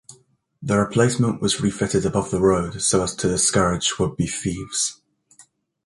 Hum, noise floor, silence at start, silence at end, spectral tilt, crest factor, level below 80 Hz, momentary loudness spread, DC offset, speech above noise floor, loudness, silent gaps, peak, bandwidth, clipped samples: none; -57 dBFS; 0.1 s; 0.45 s; -4 dB/octave; 18 dB; -44 dBFS; 6 LU; under 0.1%; 36 dB; -21 LUFS; none; -4 dBFS; 11.5 kHz; under 0.1%